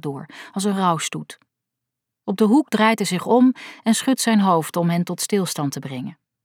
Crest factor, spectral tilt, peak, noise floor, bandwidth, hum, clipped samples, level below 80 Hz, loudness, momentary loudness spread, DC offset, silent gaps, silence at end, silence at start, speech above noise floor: 18 dB; -5 dB/octave; -4 dBFS; -83 dBFS; 17 kHz; none; under 0.1%; -74 dBFS; -20 LUFS; 16 LU; under 0.1%; none; 0.3 s; 0.05 s; 63 dB